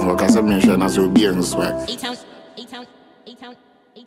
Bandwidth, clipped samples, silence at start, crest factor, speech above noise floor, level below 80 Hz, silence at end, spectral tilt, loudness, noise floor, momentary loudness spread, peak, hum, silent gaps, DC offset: 16 kHz; under 0.1%; 0 s; 18 dB; 27 dB; -44 dBFS; 0.55 s; -5 dB/octave; -17 LUFS; -44 dBFS; 22 LU; 0 dBFS; none; none; under 0.1%